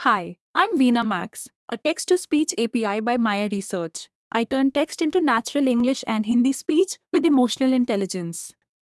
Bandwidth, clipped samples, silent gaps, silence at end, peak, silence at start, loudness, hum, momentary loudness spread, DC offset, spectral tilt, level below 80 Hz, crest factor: 12 kHz; under 0.1%; 0.40-0.54 s, 1.55-1.68 s, 4.15-4.31 s; 0.35 s; -4 dBFS; 0 s; -22 LUFS; none; 10 LU; under 0.1%; -4 dB/octave; -64 dBFS; 18 dB